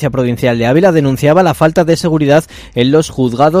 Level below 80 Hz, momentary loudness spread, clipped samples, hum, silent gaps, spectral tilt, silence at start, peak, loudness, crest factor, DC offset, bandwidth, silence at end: -38 dBFS; 5 LU; 0.5%; none; none; -6.5 dB/octave; 0 s; 0 dBFS; -11 LUFS; 10 dB; under 0.1%; 16 kHz; 0 s